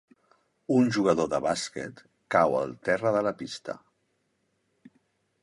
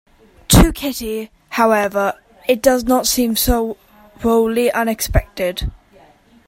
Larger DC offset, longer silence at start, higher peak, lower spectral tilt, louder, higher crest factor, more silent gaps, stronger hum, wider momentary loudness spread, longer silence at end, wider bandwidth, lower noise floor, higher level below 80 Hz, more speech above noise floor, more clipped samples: neither; first, 0.7 s vs 0.5 s; second, -6 dBFS vs 0 dBFS; about the same, -5.5 dB/octave vs -4.5 dB/octave; second, -27 LUFS vs -17 LUFS; about the same, 22 dB vs 18 dB; neither; neither; first, 16 LU vs 13 LU; first, 1.65 s vs 0.75 s; second, 11.5 kHz vs 16.5 kHz; first, -74 dBFS vs -49 dBFS; second, -64 dBFS vs -26 dBFS; first, 48 dB vs 32 dB; neither